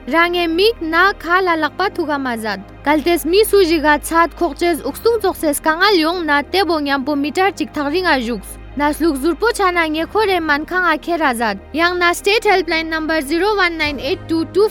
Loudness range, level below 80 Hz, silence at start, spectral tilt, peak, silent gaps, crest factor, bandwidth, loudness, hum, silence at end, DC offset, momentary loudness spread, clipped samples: 2 LU; -38 dBFS; 0 s; -3.5 dB/octave; 0 dBFS; none; 16 dB; 19.5 kHz; -16 LUFS; none; 0 s; under 0.1%; 7 LU; under 0.1%